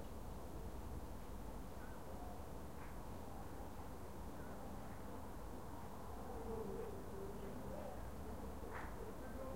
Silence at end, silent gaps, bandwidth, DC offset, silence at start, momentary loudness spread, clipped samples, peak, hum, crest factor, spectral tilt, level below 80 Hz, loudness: 0 s; none; 16 kHz; 0.2%; 0 s; 4 LU; under 0.1%; -34 dBFS; none; 14 dB; -6 dB/octave; -56 dBFS; -52 LUFS